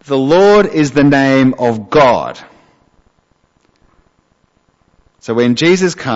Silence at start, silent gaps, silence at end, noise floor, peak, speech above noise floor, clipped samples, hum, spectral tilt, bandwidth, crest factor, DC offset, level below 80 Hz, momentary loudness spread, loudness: 0.1 s; none; 0 s; -57 dBFS; 0 dBFS; 47 dB; under 0.1%; none; -6 dB/octave; 8 kHz; 12 dB; under 0.1%; -46 dBFS; 9 LU; -11 LUFS